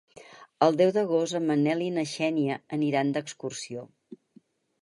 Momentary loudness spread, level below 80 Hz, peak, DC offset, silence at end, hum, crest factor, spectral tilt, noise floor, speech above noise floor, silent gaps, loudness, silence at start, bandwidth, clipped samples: 13 LU; -78 dBFS; -8 dBFS; under 0.1%; 0.65 s; none; 20 dB; -5.5 dB/octave; -60 dBFS; 34 dB; none; -27 LUFS; 0.15 s; 11.5 kHz; under 0.1%